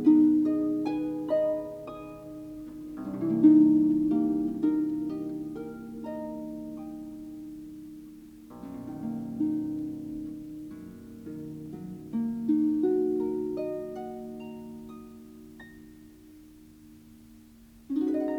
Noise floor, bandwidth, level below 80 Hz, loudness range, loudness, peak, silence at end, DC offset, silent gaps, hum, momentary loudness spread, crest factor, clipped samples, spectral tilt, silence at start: -53 dBFS; 4.6 kHz; -62 dBFS; 15 LU; -28 LUFS; -8 dBFS; 0 s; under 0.1%; none; none; 22 LU; 20 dB; under 0.1%; -9 dB/octave; 0 s